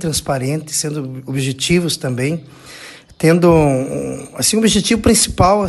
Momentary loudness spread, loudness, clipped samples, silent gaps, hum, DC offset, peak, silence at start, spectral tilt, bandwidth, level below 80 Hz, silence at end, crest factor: 14 LU; -15 LUFS; under 0.1%; none; none; under 0.1%; 0 dBFS; 0 s; -4.5 dB/octave; 13 kHz; -36 dBFS; 0 s; 16 dB